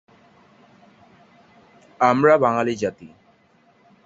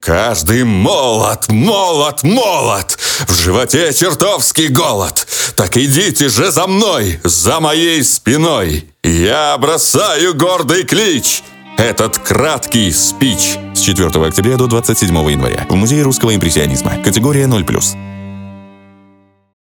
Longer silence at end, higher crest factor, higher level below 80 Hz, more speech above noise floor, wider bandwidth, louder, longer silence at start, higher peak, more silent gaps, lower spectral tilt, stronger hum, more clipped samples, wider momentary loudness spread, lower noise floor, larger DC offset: about the same, 1 s vs 1.05 s; first, 22 dB vs 12 dB; second, -64 dBFS vs -32 dBFS; about the same, 40 dB vs 37 dB; second, 7.8 kHz vs 19.5 kHz; second, -19 LUFS vs -11 LUFS; first, 2 s vs 0 s; about the same, -2 dBFS vs 0 dBFS; neither; first, -6.5 dB/octave vs -3.5 dB/octave; neither; neither; first, 11 LU vs 4 LU; first, -58 dBFS vs -48 dBFS; neither